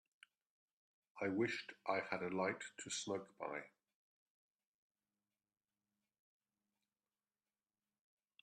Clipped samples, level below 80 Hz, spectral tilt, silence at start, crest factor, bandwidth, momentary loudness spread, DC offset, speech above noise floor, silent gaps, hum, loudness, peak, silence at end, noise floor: under 0.1%; -90 dBFS; -4 dB/octave; 1.15 s; 24 dB; 11.5 kHz; 8 LU; under 0.1%; over 47 dB; none; none; -43 LUFS; -24 dBFS; 4.75 s; under -90 dBFS